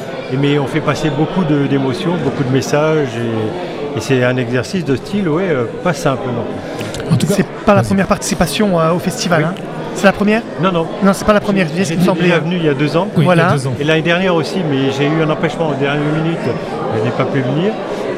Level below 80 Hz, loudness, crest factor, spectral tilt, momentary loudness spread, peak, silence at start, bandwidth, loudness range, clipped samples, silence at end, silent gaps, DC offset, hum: -40 dBFS; -15 LUFS; 14 dB; -6 dB/octave; 7 LU; 0 dBFS; 0 s; 15.5 kHz; 3 LU; under 0.1%; 0 s; none; under 0.1%; none